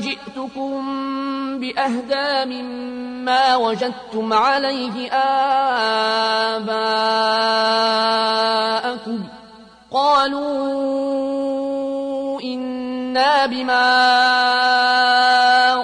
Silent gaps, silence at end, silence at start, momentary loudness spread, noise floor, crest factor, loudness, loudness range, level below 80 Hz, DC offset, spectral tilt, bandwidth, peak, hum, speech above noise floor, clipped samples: none; 0 s; 0 s; 12 LU; -44 dBFS; 12 dB; -18 LUFS; 5 LU; -62 dBFS; under 0.1%; -3 dB/octave; 10.5 kHz; -6 dBFS; none; 26 dB; under 0.1%